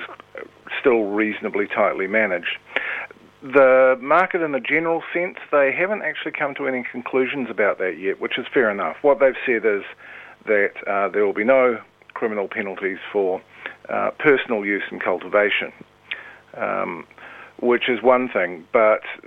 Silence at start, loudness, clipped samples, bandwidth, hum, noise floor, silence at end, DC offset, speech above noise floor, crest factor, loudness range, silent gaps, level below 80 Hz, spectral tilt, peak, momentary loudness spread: 0 s; -20 LUFS; under 0.1%; 4.3 kHz; none; -39 dBFS; 0.1 s; under 0.1%; 19 dB; 20 dB; 4 LU; none; -66 dBFS; -7 dB/octave; -2 dBFS; 16 LU